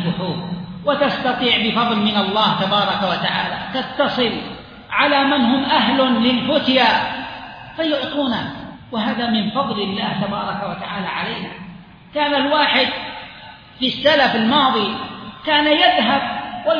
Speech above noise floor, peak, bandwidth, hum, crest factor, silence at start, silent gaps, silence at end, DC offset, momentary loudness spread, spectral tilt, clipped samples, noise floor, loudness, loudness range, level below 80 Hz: 22 dB; -2 dBFS; 5.2 kHz; none; 18 dB; 0 s; none; 0 s; under 0.1%; 15 LU; -6.5 dB/octave; under 0.1%; -39 dBFS; -18 LUFS; 5 LU; -52 dBFS